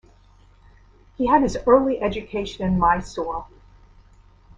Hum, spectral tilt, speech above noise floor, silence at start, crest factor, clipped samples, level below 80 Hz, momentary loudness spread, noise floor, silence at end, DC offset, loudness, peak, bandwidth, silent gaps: none; -6.5 dB/octave; 32 dB; 1.2 s; 22 dB; under 0.1%; -42 dBFS; 12 LU; -52 dBFS; 1.15 s; under 0.1%; -21 LUFS; -2 dBFS; 9.6 kHz; none